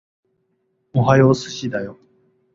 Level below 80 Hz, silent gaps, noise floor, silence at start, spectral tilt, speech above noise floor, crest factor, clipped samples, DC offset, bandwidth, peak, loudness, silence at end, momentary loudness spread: -54 dBFS; none; -68 dBFS; 0.95 s; -7 dB/octave; 51 dB; 18 dB; under 0.1%; under 0.1%; 7.6 kHz; -2 dBFS; -18 LUFS; 0.6 s; 14 LU